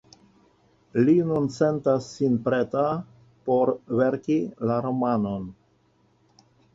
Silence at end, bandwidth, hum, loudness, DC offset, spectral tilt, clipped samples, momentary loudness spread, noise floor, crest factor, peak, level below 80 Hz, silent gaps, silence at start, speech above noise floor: 1.2 s; 7.8 kHz; none; -24 LUFS; under 0.1%; -8 dB/octave; under 0.1%; 9 LU; -64 dBFS; 18 dB; -8 dBFS; -62 dBFS; none; 0.95 s; 40 dB